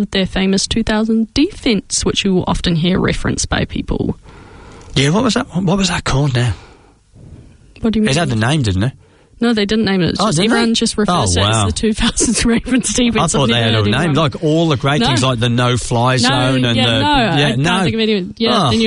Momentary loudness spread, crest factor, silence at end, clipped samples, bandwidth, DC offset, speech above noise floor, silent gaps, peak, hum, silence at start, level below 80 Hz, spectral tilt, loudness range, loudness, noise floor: 5 LU; 14 dB; 0 s; under 0.1%; 11 kHz; under 0.1%; 31 dB; none; -2 dBFS; none; 0 s; -32 dBFS; -4.5 dB/octave; 4 LU; -15 LUFS; -45 dBFS